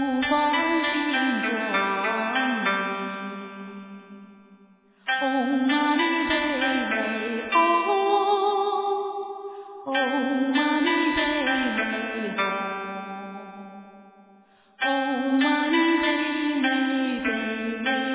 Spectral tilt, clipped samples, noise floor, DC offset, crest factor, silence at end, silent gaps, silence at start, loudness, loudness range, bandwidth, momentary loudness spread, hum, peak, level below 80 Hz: -1 dB/octave; under 0.1%; -56 dBFS; under 0.1%; 16 dB; 0 s; none; 0 s; -24 LUFS; 6 LU; 4 kHz; 14 LU; none; -8 dBFS; -60 dBFS